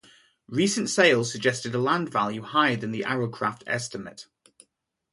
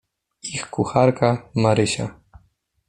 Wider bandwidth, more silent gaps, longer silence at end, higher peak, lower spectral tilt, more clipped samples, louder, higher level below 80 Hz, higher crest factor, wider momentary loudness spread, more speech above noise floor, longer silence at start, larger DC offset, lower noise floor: about the same, 11.5 kHz vs 11 kHz; neither; first, 0.9 s vs 0.75 s; second, -6 dBFS vs -2 dBFS; second, -4 dB/octave vs -5.5 dB/octave; neither; second, -25 LUFS vs -21 LUFS; second, -68 dBFS vs -52 dBFS; about the same, 20 dB vs 20 dB; about the same, 11 LU vs 13 LU; first, 47 dB vs 43 dB; about the same, 0.5 s vs 0.45 s; neither; first, -72 dBFS vs -63 dBFS